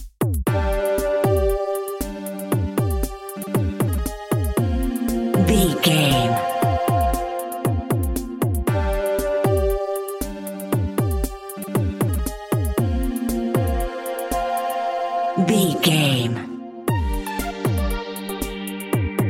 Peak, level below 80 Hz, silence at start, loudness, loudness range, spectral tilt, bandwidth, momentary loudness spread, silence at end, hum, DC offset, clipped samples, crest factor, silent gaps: -2 dBFS; -30 dBFS; 0 s; -22 LUFS; 4 LU; -5.5 dB/octave; 17 kHz; 10 LU; 0 s; none; under 0.1%; under 0.1%; 18 dB; none